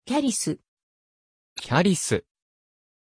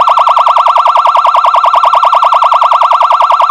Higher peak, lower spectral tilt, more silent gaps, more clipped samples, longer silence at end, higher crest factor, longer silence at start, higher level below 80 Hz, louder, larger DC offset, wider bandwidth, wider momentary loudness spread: second, -8 dBFS vs 0 dBFS; first, -4.5 dB/octave vs -0.5 dB/octave; first, 0.68-0.77 s, 0.83-1.56 s vs none; second, under 0.1% vs 3%; first, 0.9 s vs 0 s; first, 20 dB vs 6 dB; about the same, 0.05 s vs 0 s; second, -60 dBFS vs -50 dBFS; second, -24 LUFS vs -6 LUFS; neither; second, 11 kHz vs 12.5 kHz; first, 16 LU vs 0 LU